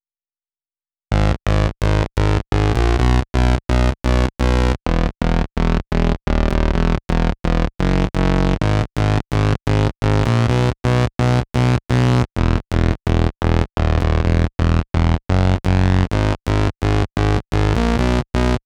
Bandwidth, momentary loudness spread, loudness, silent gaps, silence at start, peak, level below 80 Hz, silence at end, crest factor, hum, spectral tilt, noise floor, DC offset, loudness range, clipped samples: 11 kHz; 3 LU; -18 LUFS; none; 1.1 s; -2 dBFS; -22 dBFS; 0.1 s; 14 dB; none; -7 dB/octave; under -90 dBFS; under 0.1%; 2 LU; under 0.1%